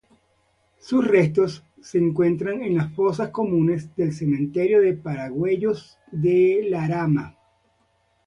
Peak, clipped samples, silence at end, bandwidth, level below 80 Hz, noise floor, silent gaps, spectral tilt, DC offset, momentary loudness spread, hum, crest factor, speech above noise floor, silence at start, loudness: -4 dBFS; under 0.1%; 0.95 s; 10 kHz; -58 dBFS; -66 dBFS; none; -8.5 dB/octave; under 0.1%; 8 LU; none; 18 dB; 45 dB; 0.85 s; -22 LUFS